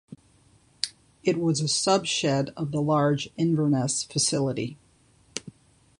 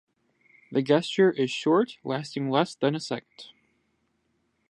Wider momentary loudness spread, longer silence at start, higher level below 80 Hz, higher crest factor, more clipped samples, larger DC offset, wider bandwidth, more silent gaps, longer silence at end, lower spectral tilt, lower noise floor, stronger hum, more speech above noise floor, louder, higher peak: first, 12 LU vs 9 LU; second, 0.1 s vs 0.7 s; first, -62 dBFS vs -78 dBFS; about the same, 22 dB vs 20 dB; neither; neither; about the same, 11.5 kHz vs 11 kHz; neither; second, 0.5 s vs 1.25 s; second, -4.5 dB/octave vs -6 dB/octave; second, -60 dBFS vs -73 dBFS; neither; second, 36 dB vs 47 dB; about the same, -25 LUFS vs -26 LUFS; about the same, -6 dBFS vs -6 dBFS